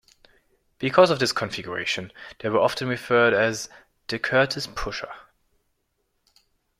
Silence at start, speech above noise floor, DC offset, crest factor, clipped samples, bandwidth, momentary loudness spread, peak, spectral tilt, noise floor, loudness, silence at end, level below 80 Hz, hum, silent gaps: 0.8 s; 50 dB; under 0.1%; 24 dB; under 0.1%; 15.5 kHz; 17 LU; -2 dBFS; -4 dB/octave; -73 dBFS; -23 LUFS; 1.6 s; -52 dBFS; none; none